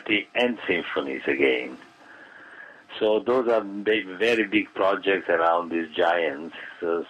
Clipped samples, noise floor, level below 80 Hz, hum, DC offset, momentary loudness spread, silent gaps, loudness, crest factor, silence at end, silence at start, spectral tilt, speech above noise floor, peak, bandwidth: under 0.1%; -48 dBFS; -66 dBFS; none; under 0.1%; 16 LU; none; -24 LUFS; 18 dB; 0 s; 0 s; -5 dB/octave; 24 dB; -8 dBFS; 10 kHz